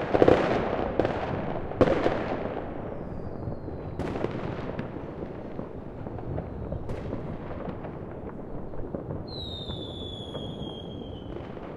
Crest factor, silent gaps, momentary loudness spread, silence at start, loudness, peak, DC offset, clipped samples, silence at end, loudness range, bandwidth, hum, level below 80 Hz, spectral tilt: 28 dB; none; 14 LU; 0 s; -31 LUFS; -4 dBFS; under 0.1%; under 0.1%; 0 s; 8 LU; 11 kHz; none; -44 dBFS; -7.5 dB/octave